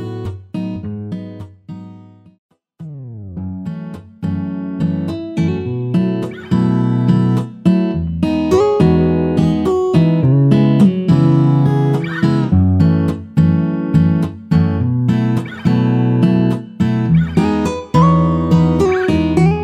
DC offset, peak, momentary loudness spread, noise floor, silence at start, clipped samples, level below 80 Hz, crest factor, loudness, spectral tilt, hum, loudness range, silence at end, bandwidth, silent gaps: under 0.1%; 0 dBFS; 15 LU; -40 dBFS; 0 s; under 0.1%; -36 dBFS; 14 dB; -15 LUFS; -9 dB/octave; none; 14 LU; 0 s; 8.8 kHz; 2.38-2.49 s